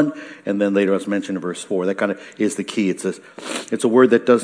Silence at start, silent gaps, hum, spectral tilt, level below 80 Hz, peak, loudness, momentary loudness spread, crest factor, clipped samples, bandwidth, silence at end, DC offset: 0 s; none; none; -5.5 dB/octave; -74 dBFS; 0 dBFS; -20 LUFS; 13 LU; 18 dB; under 0.1%; 10.5 kHz; 0 s; under 0.1%